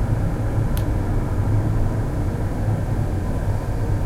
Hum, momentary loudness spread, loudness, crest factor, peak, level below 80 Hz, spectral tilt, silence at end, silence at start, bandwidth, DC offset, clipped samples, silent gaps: none; 3 LU; -23 LUFS; 12 dB; -8 dBFS; -26 dBFS; -8 dB/octave; 0 s; 0 s; 14.5 kHz; under 0.1%; under 0.1%; none